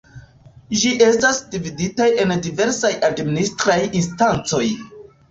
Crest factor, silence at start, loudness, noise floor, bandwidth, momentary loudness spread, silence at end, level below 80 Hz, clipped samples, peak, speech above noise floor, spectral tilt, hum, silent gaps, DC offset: 16 dB; 0.15 s; -18 LUFS; -46 dBFS; 8.2 kHz; 9 LU; 0.3 s; -50 dBFS; under 0.1%; -2 dBFS; 28 dB; -4 dB/octave; none; none; under 0.1%